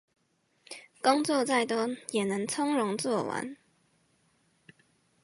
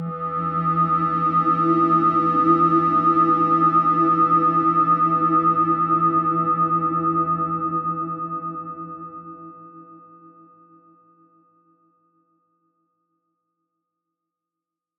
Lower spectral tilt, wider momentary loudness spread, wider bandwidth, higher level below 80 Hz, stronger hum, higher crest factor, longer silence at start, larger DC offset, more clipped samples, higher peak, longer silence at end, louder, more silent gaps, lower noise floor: second, -4 dB/octave vs -10 dB/octave; about the same, 16 LU vs 14 LU; first, 11.5 kHz vs 5.4 kHz; second, -80 dBFS vs -64 dBFS; neither; first, 22 dB vs 16 dB; first, 0.7 s vs 0 s; neither; neither; second, -10 dBFS vs -6 dBFS; second, 1.7 s vs 5 s; second, -29 LUFS vs -19 LUFS; neither; second, -73 dBFS vs -87 dBFS